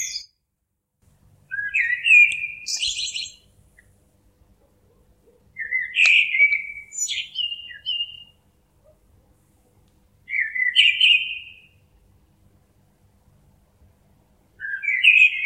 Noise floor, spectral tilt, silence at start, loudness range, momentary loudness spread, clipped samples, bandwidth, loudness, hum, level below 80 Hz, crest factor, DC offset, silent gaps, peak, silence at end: -77 dBFS; 3.5 dB/octave; 0 s; 11 LU; 19 LU; under 0.1%; 14 kHz; -18 LUFS; none; -62 dBFS; 22 dB; under 0.1%; none; -2 dBFS; 0 s